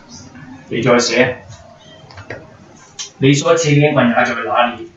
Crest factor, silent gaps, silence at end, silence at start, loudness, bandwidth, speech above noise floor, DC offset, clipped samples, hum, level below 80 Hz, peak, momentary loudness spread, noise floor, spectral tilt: 16 dB; none; 0.1 s; 0.1 s; -14 LUFS; 8 kHz; 28 dB; under 0.1%; under 0.1%; none; -54 dBFS; 0 dBFS; 22 LU; -42 dBFS; -5 dB/octave